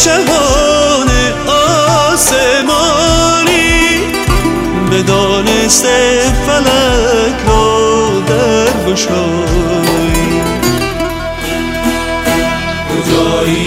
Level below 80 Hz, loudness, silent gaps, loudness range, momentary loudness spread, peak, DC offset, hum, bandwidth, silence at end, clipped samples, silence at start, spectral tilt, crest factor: -22 dBFS; -10 LUFS; none; 4 LU; 6 LU; 0 dBFS; under 0.1%; none; 16.5 kHz; 0 s; under 0.1%; 0 s; -3.5 dB/octave; 10 dB